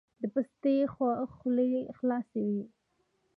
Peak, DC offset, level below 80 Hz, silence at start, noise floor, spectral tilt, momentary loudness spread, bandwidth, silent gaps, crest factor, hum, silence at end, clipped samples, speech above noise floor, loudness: -18 dBFS; under 0.1%; -72 dBFS; 0.2 s; -76 dBFS; -10 dB/octave; 6 LU; 4.9 kHz; none; 14 dB; none; 0.7 s; under 0.1%; 45 dB; -32 LUFS